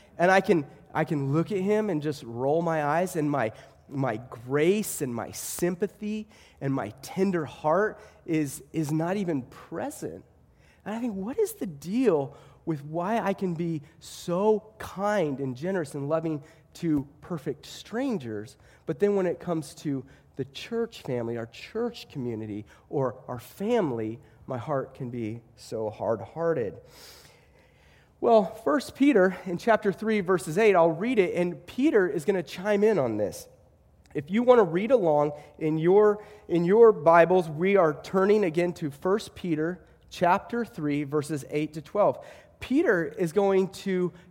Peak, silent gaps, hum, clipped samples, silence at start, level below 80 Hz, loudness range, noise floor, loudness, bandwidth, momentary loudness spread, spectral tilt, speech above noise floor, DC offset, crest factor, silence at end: -6 dBFS; none; none; under 0.1%; 0.2 s; -62 dBFS; 10 LU; -59 dBFS; -27 LUFS; 16.5 kHz; 14 LU; -6.5 dB/octave; 32 dB; under 0.1%; 22 dB; 0.15 s